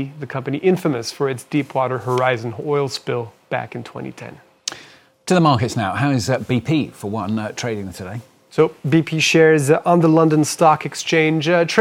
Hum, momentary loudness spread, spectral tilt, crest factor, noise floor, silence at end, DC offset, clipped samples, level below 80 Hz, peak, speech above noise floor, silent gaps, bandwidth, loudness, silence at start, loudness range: none; 16 LU; -5.5 dB/octave; 18 dB; -46 dBFS; 0 s; under 0.1%; under 0.1%; -62 dBFS; 0 dBFS; 28 dB; none; 16 kHz; -18 LUFS; 0 s; 7 LU